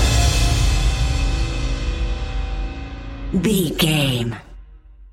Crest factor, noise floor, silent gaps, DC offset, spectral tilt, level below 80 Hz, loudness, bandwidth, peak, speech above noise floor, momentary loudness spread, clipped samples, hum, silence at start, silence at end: 16 dB; -42 dBFS; none; under 0.1%; -4.5 dB/octave; -22 dBFS; -21 LUFS; 16.5 kHz; -4 dBFS; 24 dB; 13 LU; under 0.1%; none; 0 s; 0.05 s